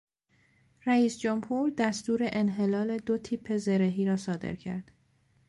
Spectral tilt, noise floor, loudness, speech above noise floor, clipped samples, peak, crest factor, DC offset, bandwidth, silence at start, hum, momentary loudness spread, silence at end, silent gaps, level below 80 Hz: -6.5 dB/octave; -68 dBFS; -29 LUFS; 40 dB; under 0.1%; -14 dBFS; 16 dB; under 0.1%; 11.5 kHz; 0.85 s; none; 10 LU; 0.65 s; none; -64 dBFS